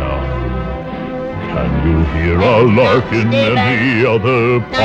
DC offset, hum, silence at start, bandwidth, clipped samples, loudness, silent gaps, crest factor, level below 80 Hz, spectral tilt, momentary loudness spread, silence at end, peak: under 0.1%; none; 0 s; 8 kHz; under 0.1%; -14 LUFS; none; 12 dB; -26 dBFS; -7.5 dB/octave; 12 LU; 0 s; 0 dBFS